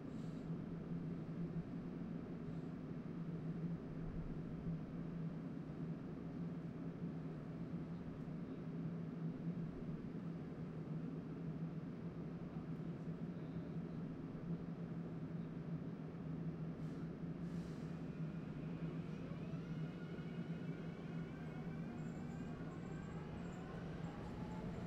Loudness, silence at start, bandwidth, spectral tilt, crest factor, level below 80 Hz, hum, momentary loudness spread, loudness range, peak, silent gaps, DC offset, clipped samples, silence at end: -48 LUFS; 0 s; 8 kHz; -9 dB/octave; 12 dB; -64 dBFS; none; 3 LU; 1 LU; -34 dBFS; none; under 0.1%; under 0.1%; 0 s